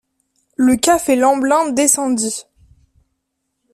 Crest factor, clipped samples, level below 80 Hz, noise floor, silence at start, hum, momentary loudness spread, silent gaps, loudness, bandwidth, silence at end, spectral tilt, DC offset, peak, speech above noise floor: 18 dB; under 0.1%; -52 dBFS; -73 dBFS; 0.6 s; none; 9 LU; none; -15 LUFS; 15.5 kHz; 1.3 s; -2.5 dB/octave; under 0.1%; 0 dBFS; 59 dB